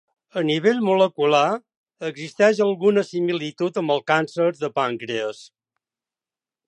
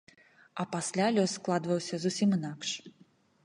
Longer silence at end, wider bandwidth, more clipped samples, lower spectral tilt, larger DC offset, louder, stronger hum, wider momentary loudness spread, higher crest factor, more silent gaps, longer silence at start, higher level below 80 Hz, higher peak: first, 1.2 s vs 0.55 s; second, 9.2 kHz vs 11.5 kHz; neither; about the same, -5.5 dB/octave vs -5 dB/octave; neither; first, -21 LUFS vs -31 LUFS; neither; first, 13 LU vs 10 LU; about the same, 18 dB vs 18 dB; first, 1.77-1.84 s vs none; second, 0.35 s vs 0.55 s; about the same, -76 dBFS vs -76 dBFS; first, -4 dBFS vs -14 dBFS